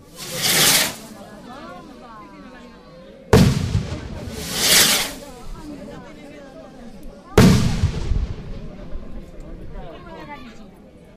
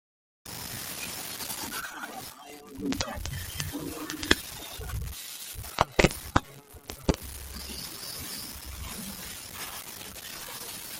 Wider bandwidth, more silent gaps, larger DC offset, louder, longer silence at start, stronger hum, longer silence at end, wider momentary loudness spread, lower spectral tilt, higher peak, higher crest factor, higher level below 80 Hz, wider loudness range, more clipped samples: about the same, 16 kHz vs 17 kHz; neither; neither; first, -17 LUFS vs -33 LUFS; second, 0.15 s vs 0.45 s; neither; first, 0.2 s vs 0 s; first, 26 LU vs 13 LU; about the same, -3.5 dB/octave vs -3.5 dB/octave; about the same, -2 dBFS vs -4 dBFS; second, 20 dB vs 30 dB; first, -32 dBFS vs -44 dBFS; about the same, 5 LU vs 7 LU; neither